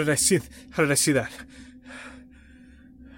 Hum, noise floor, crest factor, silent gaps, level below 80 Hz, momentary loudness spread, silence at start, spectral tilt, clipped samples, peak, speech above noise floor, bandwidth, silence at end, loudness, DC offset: none; -50 dBFS; 18 dB; none; -52 dBFS; 23 LU; 0 s; -3.5 dB/octave; under 0.1%; -8 dBFS; 26 dB; 17 kHz; 0.1 s; -23 LUFS; under 0.1%